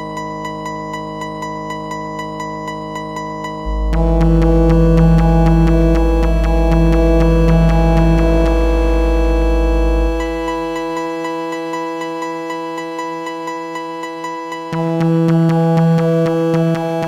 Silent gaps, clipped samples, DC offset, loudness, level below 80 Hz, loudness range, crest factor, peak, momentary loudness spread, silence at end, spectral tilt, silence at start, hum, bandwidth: none; under 0.1%; under 0.1%; -16 LUFS; -18 dBFS; 10 LU; 14 dB; 0 dBFS; 12 LU; 0 s; -8 dB/octave; 0 s; none; 9.4 kHz